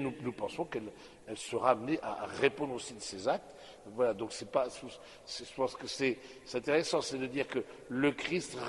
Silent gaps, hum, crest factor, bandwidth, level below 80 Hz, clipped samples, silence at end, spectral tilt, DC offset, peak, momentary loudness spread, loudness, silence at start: none; none; 24 dB; 11.5 kHz; -68 dBFS; under 0.1%; 0 s; -4 dB/octave; under 0.1%; -12 dBFS; 15 LU; -35 LUFS; 0 s